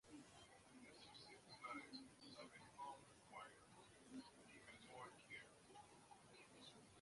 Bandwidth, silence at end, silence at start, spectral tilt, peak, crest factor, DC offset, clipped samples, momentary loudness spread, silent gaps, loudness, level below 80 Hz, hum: 11.5 kHz; 0 s; 0.05 s; -3 dB/octave; -42 dBFS; 20 dB; under 0.1%; under 0.1%; 10 LU; none; -61 LUFS; -86 dBFS; none